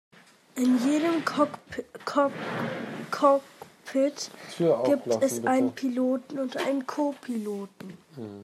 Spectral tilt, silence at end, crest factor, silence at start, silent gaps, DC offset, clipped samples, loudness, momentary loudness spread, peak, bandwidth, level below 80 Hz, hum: -5 dB/octave; 0 s; 18 dB; 0.55 s; none; under 0.1%; under 0.1%; -27 LUFS; 15 LU; -10 dBFS; 14.5 kHz; -76 dBFS; none